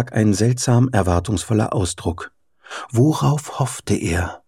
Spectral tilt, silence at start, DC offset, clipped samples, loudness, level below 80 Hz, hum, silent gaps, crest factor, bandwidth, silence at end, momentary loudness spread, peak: -6 dB/octave; 0 s; under 0.1%; under 0.1%; -19 LUFS; -40 dBFS; none; none; 18 dB; 15 kHz; 0.1 s; 11 LU; -2 dBFS